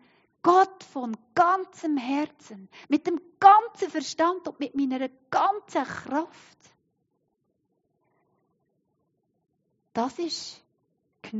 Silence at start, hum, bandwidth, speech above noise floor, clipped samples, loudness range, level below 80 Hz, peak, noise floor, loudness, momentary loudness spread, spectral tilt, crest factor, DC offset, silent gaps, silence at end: 0.45 s; none; 8 kHz; 50 dB; under 0.1%; 14 LU; -78 dBFS; -4 dBFS; -75 dBFS; -25 LUFS; 15 LU; -2.5 dB/octave; 24 dB; under 0.1%; none; 0 s